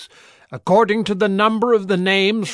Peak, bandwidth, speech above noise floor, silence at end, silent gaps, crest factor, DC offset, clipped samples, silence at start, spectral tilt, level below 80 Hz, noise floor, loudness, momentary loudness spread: -2 dBFS; 11 kHz; 28 dB; 0 s; none; 14 dB; under 0.1%; under 0.1%; 0 s; -5.5 dB/octave; -60 dBFS; -45 dBFS; -17 LUFS; 5 LU